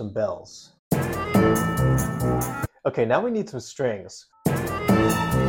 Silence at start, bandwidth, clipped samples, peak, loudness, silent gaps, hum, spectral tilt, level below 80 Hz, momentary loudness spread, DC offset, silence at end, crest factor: 0 s; 17 kHz; under 0.1%; -8 dBFS; -24 LUFS; 0.79-0.91 s; none; -6 dB/octave; -40 dBFS; 9 LU; under 0.1%; 0 s; 16 dB